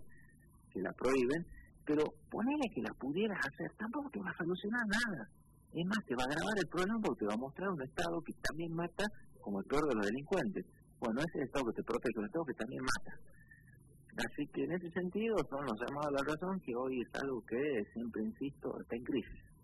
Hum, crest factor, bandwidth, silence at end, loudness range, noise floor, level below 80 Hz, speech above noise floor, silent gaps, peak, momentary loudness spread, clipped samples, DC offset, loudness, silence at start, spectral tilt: none; 20 dB; 12 kHz; 0.1 s; 3 LU; -63 dBFS; -60 dBFS; 25 dB; none; -18 dBFS; 8 LU; under 0.1%; under 0.1%; -38 LUFS; 0 s; -5.5 dB/octave